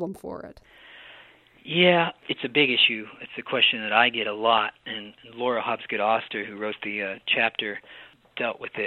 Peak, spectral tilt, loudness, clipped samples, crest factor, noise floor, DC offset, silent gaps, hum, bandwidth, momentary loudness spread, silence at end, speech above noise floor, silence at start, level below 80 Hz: -4 dBFS; -6 dB/octave; -23 LUFS; under 0.1%; 22 dB; -53 dBFS; under 0.1%; none; none; 11 kHz; 17 LU; 0 s; 27 dB; 0 s; -68 dBFS